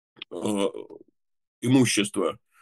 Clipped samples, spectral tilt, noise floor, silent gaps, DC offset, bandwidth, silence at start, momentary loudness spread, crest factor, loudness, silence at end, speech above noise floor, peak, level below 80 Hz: under 0.1%; -4.5 dB/octave; -60 dBFS; 1.47-1.62 s; under 0.1%; 12.5 kHz; 0.3 s; 20 LU; 20 dB; -25 LUFS; 0.25 s; 36 dB; -8 dBFS; -68 dBFS